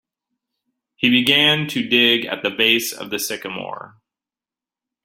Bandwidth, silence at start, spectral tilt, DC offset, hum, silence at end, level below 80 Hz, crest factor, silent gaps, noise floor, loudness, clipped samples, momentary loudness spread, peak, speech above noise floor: 16.5 kHz; 1 s; -3 dB/octave; under 0.1%; none; 1.15 s; -64 dBFS; 20 dB; none; under -90 dBFS; -17 LUFS; under 0.1%; 15 LU; -2 dBFS; over 71 dB